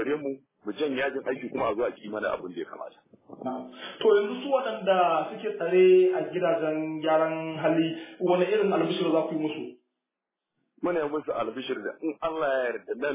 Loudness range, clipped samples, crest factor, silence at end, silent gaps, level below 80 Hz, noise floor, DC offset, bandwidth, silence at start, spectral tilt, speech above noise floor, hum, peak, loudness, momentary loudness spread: 8 LU; under 0.1%; 16 dB; 0 s; none; -70 dBFS; -87 dBFS; under 0.1%; 3.9 kHz; 0 s; -9.5 dB/octave; 61 dB; none; -10 dBFS; -27 LUFS; 14 LU